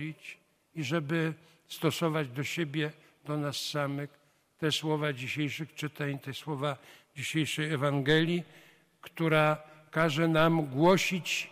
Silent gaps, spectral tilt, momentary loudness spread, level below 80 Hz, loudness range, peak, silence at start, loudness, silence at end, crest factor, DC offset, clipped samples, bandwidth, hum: none; -5 dB/octave; 16 LU; -66 dBFS; 6 LU; -12 dBFS; 0 s; -30 LUFS; 0 s; 18 dB; under 0.1%; under 0.1%; 15.5 kHz; none